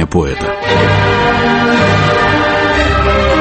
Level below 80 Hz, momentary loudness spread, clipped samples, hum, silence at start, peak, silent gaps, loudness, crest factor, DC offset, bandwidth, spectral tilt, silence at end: -24 dBFS; 4 LU; under 0.1%; none; 0 s; 0 dBFS; none; -11 LUFS; 10 dB; under 0.1%; 8.6 kHz; -6 dB/octave; 0 s